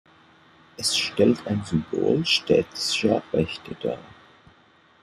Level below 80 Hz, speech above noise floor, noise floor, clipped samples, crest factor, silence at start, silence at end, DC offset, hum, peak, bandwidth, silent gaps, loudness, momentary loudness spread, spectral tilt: -58 dBFS; 34 dB; -57 dBFS; under 0.1%; 20 dB; 0.8 s; 0.95 s; under 0.1%; none; -6 dBFS; 14.5 kHz; none; -23 LUFS; 11 LU; -4 dB/octave